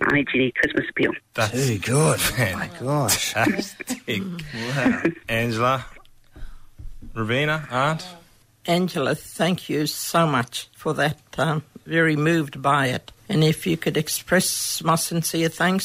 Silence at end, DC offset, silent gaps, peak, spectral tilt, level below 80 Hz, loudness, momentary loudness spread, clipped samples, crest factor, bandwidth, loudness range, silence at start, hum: 0 s; under 0.1%; none; -4 dBFS; -4.5 dB/octave; -48 dBFS; -22 LUFS; 9 LU; under 0.1%; 18 dB; 16 kHz; 4 LU; 0 s; none